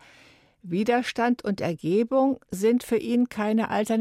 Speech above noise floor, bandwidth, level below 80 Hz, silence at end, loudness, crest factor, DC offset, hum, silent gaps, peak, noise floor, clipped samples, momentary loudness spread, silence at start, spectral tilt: 32 dB; 15.5 kHz; -64 dBFS; 0 s; -25 LUFS; 14 dB; under 0.1%; none; none; -10 dBFS; -56 dBFS; under 0.1%; 4 LU; 0.65 s; -6 dB/octave